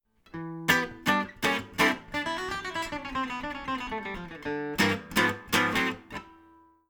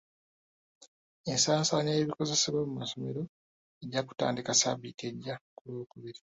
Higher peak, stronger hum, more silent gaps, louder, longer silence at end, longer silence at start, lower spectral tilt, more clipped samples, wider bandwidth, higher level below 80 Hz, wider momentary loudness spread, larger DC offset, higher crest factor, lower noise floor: first, -6 dBFS vs -12 dBFS; neither; second, none vs 0.88-1.24 s, 3.29-3.81 s, 5.41-5.65 s; about the same, -28 LUFS vs -30 LUFS; first, 0.55 s vs 0.2 s; second, 0.35 s vs 0.8 s; about the same, -3.5 dB/octave vs -3.5 dB/octave; neither; first, over 20 kHz vs 8.4 kHz; first, -54 dBFS vs -70 dBFS; second, 12 LU vs 17 LU; neither; about the same, 24 dB vs 22 dB; second, -58 dBFS vs under -90 dBFS